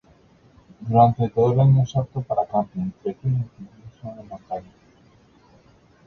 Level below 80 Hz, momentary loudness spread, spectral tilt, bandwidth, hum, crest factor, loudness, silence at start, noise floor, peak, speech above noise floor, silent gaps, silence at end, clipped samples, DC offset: -52 dBFS; 21 LU; -9.5 dB/octave; 6.4 kHz; none; 20 dB; -21 LUFS; 0.8 s; -55 dBFS; -2 dBFS; 33 dB; none; 1.45 s; under 0.1%; under 0.1%